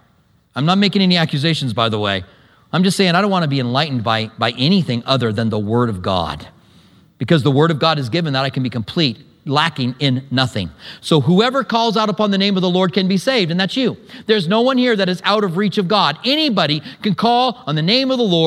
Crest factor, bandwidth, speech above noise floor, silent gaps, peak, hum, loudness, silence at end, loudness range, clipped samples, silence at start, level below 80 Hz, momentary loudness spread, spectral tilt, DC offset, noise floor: 16 dB; 13 kHz; 40 dB; none; 0 dBFS; none; -16 LUFS; 0 s; 2 LU; under 0.1%; 0.55 s; -54 dBFS; 7 LU; -6 dB/octave; under 0.1%; -56 dBFS